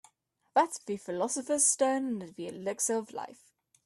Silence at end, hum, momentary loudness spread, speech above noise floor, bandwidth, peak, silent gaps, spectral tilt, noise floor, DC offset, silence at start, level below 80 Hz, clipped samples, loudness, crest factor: 0.5 s; none; 16 LU; 41 dB; 14.5 kHz; -12 dBFS; none; -2.5 dB/octave; -72 dBFS; under 0.1%; 0.55 s; -80 dBFS; under 0.1%; -30 LUFS; 20 dB